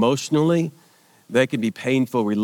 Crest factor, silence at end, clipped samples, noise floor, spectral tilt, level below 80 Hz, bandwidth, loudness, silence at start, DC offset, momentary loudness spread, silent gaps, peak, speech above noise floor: 18 dB; 0 s; under 0.1%; -54 dBFS; -6 dB/octave; -76 dBFS; 18 kHz; -21 LUFS; 0 s; under 0.1%; 5 LU; none; -4 dBFS; 34 dB